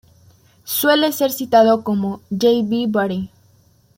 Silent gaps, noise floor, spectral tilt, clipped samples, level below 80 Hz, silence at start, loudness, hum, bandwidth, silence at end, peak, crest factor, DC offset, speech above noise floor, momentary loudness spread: none; -54 dBFS; -4.5 dB/octave; under 0.1%; -60 dBFS; 0.65 s; -17 LUFS; none; 16.5 kHz; 0.7 s; -2 dBFS; 16 dB; under 0.1%; 38 dB; 10 LU